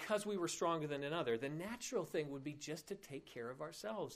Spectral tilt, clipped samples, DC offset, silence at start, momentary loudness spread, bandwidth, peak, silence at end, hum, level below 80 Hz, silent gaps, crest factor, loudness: -4.5 dB/octave; under 0.1%; under 0.1%; 0 s; 10 LU; 15.5 kHz; -26 dBFS; 0 s; none; -76 dBFS; none; 18 dB; -43 LUFS